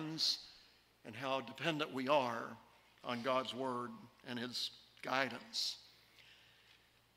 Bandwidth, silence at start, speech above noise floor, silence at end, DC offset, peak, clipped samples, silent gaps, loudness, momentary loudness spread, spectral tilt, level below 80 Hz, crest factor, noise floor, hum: 16 kHz; 0 s; 29 dB; 0.8 s; under 0.1%; -18 dBFS; under 0.1%; none; -39 LUFS; 16 LU; -3.5 dB/octave; -82 dBFS; 24 dB; -69 dBFS; none